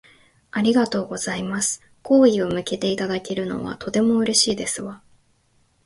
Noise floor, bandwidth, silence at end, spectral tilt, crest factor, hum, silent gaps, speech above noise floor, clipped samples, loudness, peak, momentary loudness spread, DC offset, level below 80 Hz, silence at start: -62 dBFS; 11.5 kHz; 0.9 s; -3.5 dB/octave; 18 dB; none; none; 42 dB; under 0.1%; -21 LUFS; -4 dBFS; 12 LU; under 0.1%; -56 dBFS; 0.55 s